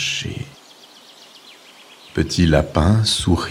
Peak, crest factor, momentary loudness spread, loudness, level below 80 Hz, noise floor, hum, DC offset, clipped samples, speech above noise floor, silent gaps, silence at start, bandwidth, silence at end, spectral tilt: -2 dBFS; 20 dB; 14 LU; -18 LUFS; -34 dBFS; -45 dBFS; none; under 0.1%; under 0.1%; 29 dB; none; 0 s; 15.5 kHz; 0 s; -5 dB/octave